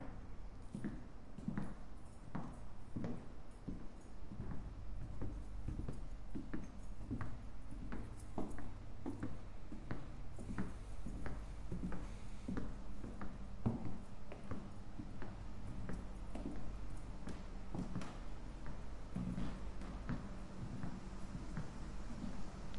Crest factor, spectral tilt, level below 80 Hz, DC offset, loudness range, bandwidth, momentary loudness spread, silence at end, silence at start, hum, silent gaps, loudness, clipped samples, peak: 18 dB; -7 dB/octave; -50 dBFS; under 0.1%; 3 LU; 11.5 kHz; 7 LU; 0 s; 0 s; none; none; -50 LUFS; under 0.1%; -24 dBFS